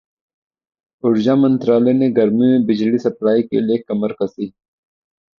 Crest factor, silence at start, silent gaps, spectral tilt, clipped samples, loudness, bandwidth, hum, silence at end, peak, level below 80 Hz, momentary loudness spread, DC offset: 14 dB; 1.05 s; none; -8.5 dB/octave; under 0.1%; -16 LUFS; 6.6 kHz; none; 0.9 s; -2 dBFS; -60 dBFS; 9 LU; under 0.1%